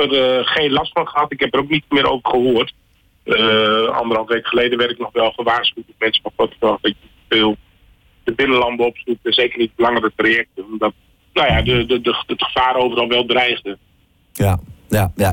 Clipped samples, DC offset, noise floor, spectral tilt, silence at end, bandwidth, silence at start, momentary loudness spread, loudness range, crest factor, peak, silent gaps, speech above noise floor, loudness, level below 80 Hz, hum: under 0.1%; under 0.1%; -52 dBFS; -5.5 dB/octave; 0 s; 17.5 kHz; 0 s; 8 LU; 2 LU; 12 dB; -6 dBFS; none; 35 dB; -17 LUFS; -40 dBFS; none